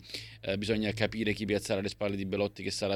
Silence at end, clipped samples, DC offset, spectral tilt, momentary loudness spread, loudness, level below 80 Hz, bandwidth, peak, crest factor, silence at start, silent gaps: 0 s; under 0.1%; under 0.1%; -5 dB/octave; 5 LU; -32 LUFS; -56 dBFS; 16 kHz; -14 dBFS; 20 dB; 0 s; none